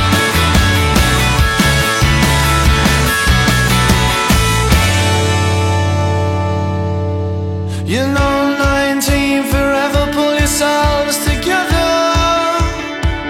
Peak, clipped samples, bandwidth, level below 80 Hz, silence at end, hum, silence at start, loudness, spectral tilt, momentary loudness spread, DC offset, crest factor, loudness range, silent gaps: 0 dBFS; under 0.1%; 16.5 kHz; -20 dBFS; 0 s; none; 0 s; -13 LUFS; -4.5 dB/octave; 6 LU; under 0.1%; 12 dB; 4 LU; none